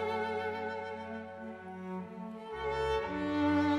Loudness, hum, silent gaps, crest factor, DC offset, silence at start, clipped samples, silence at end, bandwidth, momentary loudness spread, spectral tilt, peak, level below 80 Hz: -36 LUFS; none; none; 14 dB; under 0.1%; 0 s; under 0.1%; 0 s; 9.4 kHz; 13 LU; -6.5 dB/octave; -20 dBFS; -56 dBFS